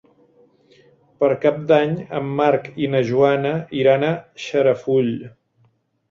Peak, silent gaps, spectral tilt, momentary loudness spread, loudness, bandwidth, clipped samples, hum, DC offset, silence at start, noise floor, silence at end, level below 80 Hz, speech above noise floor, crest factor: -2 dBFS; none; -7 dB/octave; 8 LU; -19 LUFS; 7.4 kHz; under 0.1%; none; under 0.1%; 1.2 s; -61 dBFS; 0.8 s; -62 dBFS; 43 dB; 18 dB